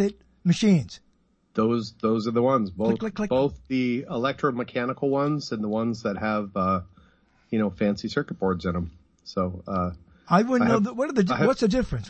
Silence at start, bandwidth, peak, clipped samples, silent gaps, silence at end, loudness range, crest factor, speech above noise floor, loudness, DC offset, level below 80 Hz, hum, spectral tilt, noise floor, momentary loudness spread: 0 s; 8.6 kHz; -8 dBFS; under 0.1%; none; 0 s; 4 LU; 18 dB; 41 dB; -25 LUFS; under 0.1%; -50 dBFS; none; -7 dB/octave; -65 dBFS; 8 LU